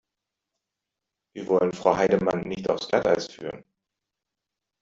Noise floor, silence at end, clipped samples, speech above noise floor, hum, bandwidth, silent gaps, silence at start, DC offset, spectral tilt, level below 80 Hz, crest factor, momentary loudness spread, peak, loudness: -86 dBFS; 1.2 s; under 0.1%; 62 dB; none; 7.8 kHz; none; 1.35 s; under 0.1%; -5.5 dB/octave; -60 dBFS; 22 dB; 16 LU; -4 dBFS; -24 LUFS